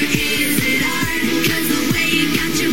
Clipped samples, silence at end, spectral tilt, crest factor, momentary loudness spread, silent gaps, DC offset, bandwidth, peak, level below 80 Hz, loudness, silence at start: under 0.1%; 0 s; -3 dB/octave; 16 dB; 2 LU; none; 4%; 17 kHz; -2 dBFS; -40 dBFS; -16 LUFS; 0 s